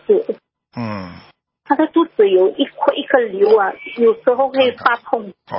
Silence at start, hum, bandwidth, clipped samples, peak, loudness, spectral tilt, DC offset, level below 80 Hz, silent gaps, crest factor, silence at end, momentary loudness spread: 0.1 s; none; 5.8 kHz; under 0.1%; 0 dBFS; -16 LUFS; -10 dB/octave; under 0.1%; -60 dBFS; none; 16 dB; 0 s; 14 LU